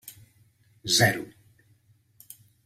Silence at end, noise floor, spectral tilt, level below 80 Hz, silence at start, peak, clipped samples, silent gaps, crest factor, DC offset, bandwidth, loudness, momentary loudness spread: 1.35 s; -63 dBFS; -2.5 dB/octave; -60 dBFS; 0.05 s; -8 dBFS; under 0.1%; none; 24 dB; under 0.1%; 16 kHz; -23 LUFS; 27 LU